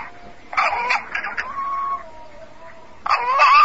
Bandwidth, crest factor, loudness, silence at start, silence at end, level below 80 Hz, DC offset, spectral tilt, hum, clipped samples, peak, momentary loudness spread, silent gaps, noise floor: 8 kHz; 18 dB; -21 LUFS; 0 s; 0 s; -54 dBFS; 1%; -1.5 dB/octave; none; under 0.1%; -4 dBFS; 24 LU; none; -43 dBFS